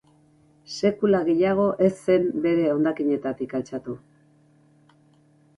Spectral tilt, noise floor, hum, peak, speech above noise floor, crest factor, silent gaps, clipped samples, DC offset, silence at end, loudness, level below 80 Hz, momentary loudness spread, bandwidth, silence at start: -7 dB/octave; -58 dBFS; none; -6 dBFS; 36 dB; 18 dB; none; under 0.1%; under 0.1%; 1.6 s; -23 LUFS; -62 dBFS; 13 LU; 11.5 kHz; 0.7 s